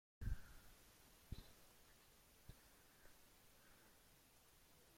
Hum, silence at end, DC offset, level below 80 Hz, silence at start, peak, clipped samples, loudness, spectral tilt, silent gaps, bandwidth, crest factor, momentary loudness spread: none; 0 s; under 0.1%; -60 dBFS; 0.2 s; -34 dBFS; under 0.1%; -62 LUFS; -4.5 dB/octave; none; 16.5 kHz; 24 dB; 16 LU